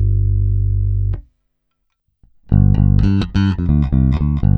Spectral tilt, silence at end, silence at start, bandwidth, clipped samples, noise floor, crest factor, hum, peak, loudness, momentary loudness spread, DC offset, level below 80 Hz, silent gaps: -9.5 dB/octave; 0 s; 0 s; 4.9 kHz; under 0.1%; -70 dBFS; 14 dB; none; 0 dBFS; -16 LUFS; 6 LU; under 0.1%; -20 dBFS; none